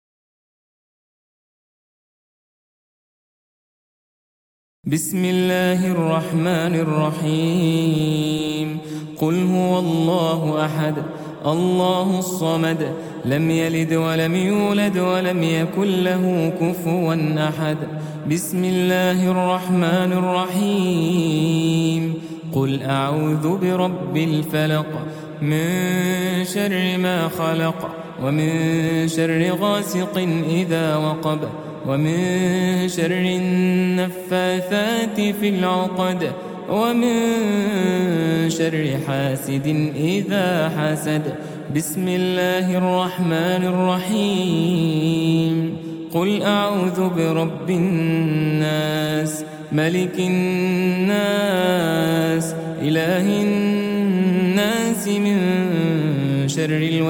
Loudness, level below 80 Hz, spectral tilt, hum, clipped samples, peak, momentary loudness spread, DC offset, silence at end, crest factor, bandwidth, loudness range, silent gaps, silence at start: -20 LUFS; -58 dBFS; -6 dB/octave; none; under 0.1%; -4 dBFS; 5 LU; under 0.1%; 0 s; 16 dB; 18 kHz; 2 LU; none; 4.85 s